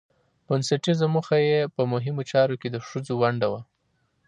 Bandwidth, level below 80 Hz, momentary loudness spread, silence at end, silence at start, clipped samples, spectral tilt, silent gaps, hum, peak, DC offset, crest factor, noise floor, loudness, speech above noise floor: 10.5 kHz; -68 dBFS; 9 LU; 0.65 s; 0.5 s; under 0.1%; -6 dB/octave; none; none; -8 dBFS; under 0.1%; 18 dB; -71 dBFS; -24 LUFS; 47 dB